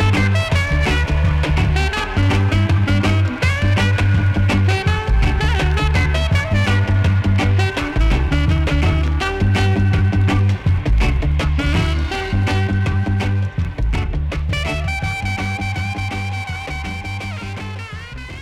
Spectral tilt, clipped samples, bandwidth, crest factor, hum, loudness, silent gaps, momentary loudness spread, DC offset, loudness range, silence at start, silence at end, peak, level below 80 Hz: -6.5 dB/octave; under 0.1%; 11 kHz; 10 dB; none; -18 LUFS; none; 8 LU; under 0.1%; 6 LU; 0 s; 0 s; -6 dBFS; -22 dBFS